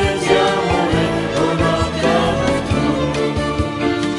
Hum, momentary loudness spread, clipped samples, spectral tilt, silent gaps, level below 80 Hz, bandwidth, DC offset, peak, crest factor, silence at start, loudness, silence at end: none; 4 LU; under 0.1%; -5.5 dB/octave; none; -34 dBFS; 11.5 kHz; under 0.1%; -2 dBFS; 16 dB; 0 s; -17 LUFS; 0 s